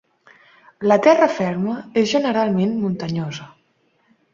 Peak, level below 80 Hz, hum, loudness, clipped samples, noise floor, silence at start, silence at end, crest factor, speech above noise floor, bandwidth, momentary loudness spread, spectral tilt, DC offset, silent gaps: -2 dBFS; -60 dBFS; none; -19 LUFS; under 0.1%; -63 dBFS; 0.8 s; 0.85 s; 18 dB; 45 dB; 7.6 kHz; 11 LU; -6 dB/octave; under 0.1%; none